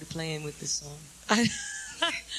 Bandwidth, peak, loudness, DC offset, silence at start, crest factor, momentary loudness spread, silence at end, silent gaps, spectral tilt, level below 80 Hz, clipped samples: 14 kHz; -8 dBFS; -30 LUFS; under 0.1%; 0 s; 24 dB; 11 LU; 0 s; none; -2.5 dB/octave; -58 dBFS; under 0.1%